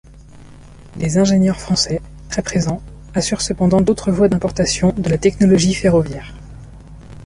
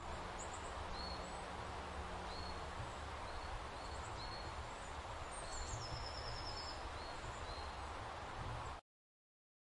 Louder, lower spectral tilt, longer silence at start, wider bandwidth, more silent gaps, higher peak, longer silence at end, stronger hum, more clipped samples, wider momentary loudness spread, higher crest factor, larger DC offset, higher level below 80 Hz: first, -16 LUFS vs -47 LUFS; first, -5.5 dB/octave vs -3.5 dB/octave; first, 0.15 s vs 0 s; about the same, 11.5 kHz vs 11.5 kHz; neither; first, -2 dBFS vs -32 dBFS; second, 0 s vs 1 s; neither; neither; first, 12 LU vs 2 LU; about the same, 16 dB vs 14 dB; neither; first, -36 dBFS vs -54 dBFS